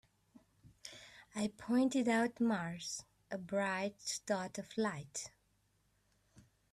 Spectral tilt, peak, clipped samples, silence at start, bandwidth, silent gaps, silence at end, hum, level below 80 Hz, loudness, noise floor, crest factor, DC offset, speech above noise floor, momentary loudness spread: -4 dB/octave; -22 dBFS; under 0.1%; 0.85 s; 13.5 kHz; none; 0.35 s; none; -76 dBFS; -38 LUFS; -76 dBFS; 18 dB; under 0.1%; 39 dB; 18 LU